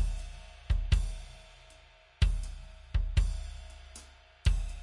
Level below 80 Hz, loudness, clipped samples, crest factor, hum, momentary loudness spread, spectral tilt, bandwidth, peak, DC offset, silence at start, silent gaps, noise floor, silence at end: -34 dBFS; -34 LUFS; under 0.1%; 18 dB; none; 21 LU; -5 dB/octave; 11.5 kHz; -14 dBFS; under 0.1%; 0 s; none; -58 dBFS; 0 s